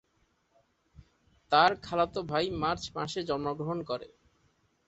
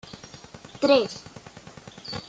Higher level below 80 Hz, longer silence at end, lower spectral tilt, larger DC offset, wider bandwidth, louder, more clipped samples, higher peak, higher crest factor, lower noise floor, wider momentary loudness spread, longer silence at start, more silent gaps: about the same, -58 dBFS vs -62 dBFS; first, 0.8 s vs 0.1 s; about the same, -5 dB/octave vs -4.5 dB/octave; neither; about the same, 8.2 kHz vs 9 kHz; second, -30 LUFS vs -23 LUFS; neither; about the same, -8 dBFS vs -8 dBFS; about the same, 24 dB vs 20 dB; first, -72 dBFS vs -46 dBFS; second, 11 LU vs 24 LU; first, 1.5 s vs 0.15 s; neither